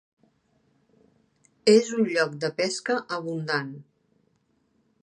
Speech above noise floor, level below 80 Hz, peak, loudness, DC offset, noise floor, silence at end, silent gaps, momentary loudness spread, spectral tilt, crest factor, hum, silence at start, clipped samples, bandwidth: 45 dB; -78 dBFS; -6 dBFS; -25 LUFS; under 0.1%; -69 dBFS; 1.2 s; none; 11 LU; -4.5 dB/octave; 22 dB; none; 1.65 s; under 0.1%; 10.5 kHz